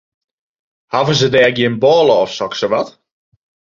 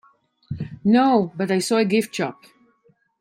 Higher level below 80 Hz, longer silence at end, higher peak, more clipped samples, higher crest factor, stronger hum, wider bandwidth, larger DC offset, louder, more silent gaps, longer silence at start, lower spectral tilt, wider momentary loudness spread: about the same, -54 dBFS vs -58 dBFS; about the same, 0.9 s vs 0.9 s; first, 0 dBFS vs -4 dBFS; neither; about the same, 14 dB vs 18 dB; neither; second, 7.6 kHz vs 16 kHz; neither; first, -14 LUFS vs -20 LUFS; neither; first, 0.9 s vs 0.5 s; about the same, -5 dB/octave vs -5.5 dB/octave; second, 8 LU vs 16 LU